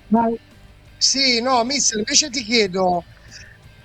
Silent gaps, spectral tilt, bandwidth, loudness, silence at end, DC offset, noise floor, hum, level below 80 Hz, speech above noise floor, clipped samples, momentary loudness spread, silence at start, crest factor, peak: none; -2 dB/octave; 9.8 kHz; -17 LUFS; 0.15 s; under 0.1%; -43 dBFS; none; -50 dBFS; 24 dB; under 0.1%; 7 LU; 0.1 s; 20 dB; -2 dBFS